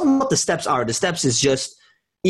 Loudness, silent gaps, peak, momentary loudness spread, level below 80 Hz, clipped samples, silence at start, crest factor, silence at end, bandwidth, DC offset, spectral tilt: -19 LUFS; none; -8 dBFS; 5 LU; -52 dBFS; under 0.1%; 0 s; 14 dB; 0 s; 12.5 kHz; under 0.1%; -3.5 dB/octave